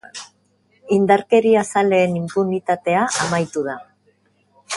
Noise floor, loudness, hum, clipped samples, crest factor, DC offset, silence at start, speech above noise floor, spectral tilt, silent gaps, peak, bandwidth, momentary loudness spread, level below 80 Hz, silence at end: -61 dBFS; -18 LUFS; none; under 0.1%; 18 dB; under 0.1%; 0.15 s; 44 dB; -5 dB/octave; none; -2 dBFS; 11.5 kHz; 13 LU; -62 dBFS; 0 s